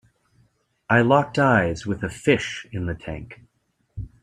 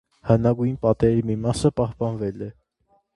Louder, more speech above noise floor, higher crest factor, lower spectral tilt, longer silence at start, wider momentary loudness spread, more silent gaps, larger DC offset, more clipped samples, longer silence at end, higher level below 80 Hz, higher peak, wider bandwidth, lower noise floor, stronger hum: about the same, -21 LUFS vs -22 LUFS; first, 48 dB vs 44 dB; about the same, 20 dB vs 20 dB; second, -6 dB/octave vs -8 dB/octave; first, 0.9 s vs 0.25 s; first, 21 LU vs 10 LU; neither; neither; neither; second, 0.15 s vs 0.65 s; about the same, -48 dBFS vs -44 dBFS; about the same, -2 dBFS vs -2 dBFS; about the same, 11.5 kHz vs 11.5 kHz; first, -70 dBFS vs -65 dBFS; neither